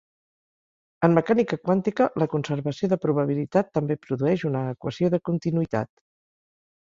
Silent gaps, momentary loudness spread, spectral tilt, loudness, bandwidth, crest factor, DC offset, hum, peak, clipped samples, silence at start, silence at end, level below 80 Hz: none; 7 LU; -8.5 dB/octave; -24 LUFS; 7.4 kHz; 22 dB; under 0.1%; none; -2 dBFS; under 0.1%; 1 s; 1 s; -62 dBFS